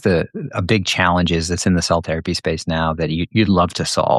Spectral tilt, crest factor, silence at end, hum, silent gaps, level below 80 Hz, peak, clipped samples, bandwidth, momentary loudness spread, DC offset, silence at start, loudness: -5 dB/octave; 16 dB; 0 s; none; none; -38 dBFS; -2 dBFS; under 0.1%; 12.5 kHz; 6 LU; under 0.1%; 0.05 s; -18 LUFS